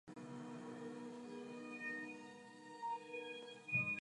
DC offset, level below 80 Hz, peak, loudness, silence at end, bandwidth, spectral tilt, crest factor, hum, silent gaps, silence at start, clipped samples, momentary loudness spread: under 0.1%; -88 dBFS; -28 dBFS; -47 LUFS; 0 s; 11 kHz; -5 dB/octave; 20 dB; none; none; 0.05 s; under 0.1%; 13 LU